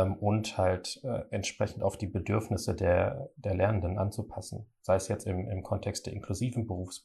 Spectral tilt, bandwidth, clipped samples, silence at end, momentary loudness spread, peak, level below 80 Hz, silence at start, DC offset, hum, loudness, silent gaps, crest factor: -6 dB/octave; 12.5 kHz; under 0.1%; 0.05 s; 9 LU; -14 dBFS; -56 dBFS; 0 s; under 0.1%; none; -32 LUFS; none; 16 dB